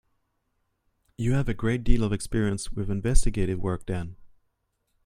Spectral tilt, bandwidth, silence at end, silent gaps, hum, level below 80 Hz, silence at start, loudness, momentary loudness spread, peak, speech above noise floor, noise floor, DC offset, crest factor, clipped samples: -6 dB/octave; 11.5 kHz; 0.8 s; none; none; -30 dBFS; 1.2 s; -28 LUFS; 5 LU; -4 dBFS; 52 dB; -75 dBFS; under 0.1%; 20 dB; under 0.1%